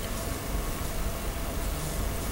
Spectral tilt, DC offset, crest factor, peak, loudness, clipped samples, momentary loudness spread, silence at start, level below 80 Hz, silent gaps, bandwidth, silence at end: -4 dB/octave; under 0.1%; 14 dB; -18 dBFS; -33 LUFS; under 0.1%; 1 LU; 0 s; -34 dBFS; none; 16 kHz; 0 s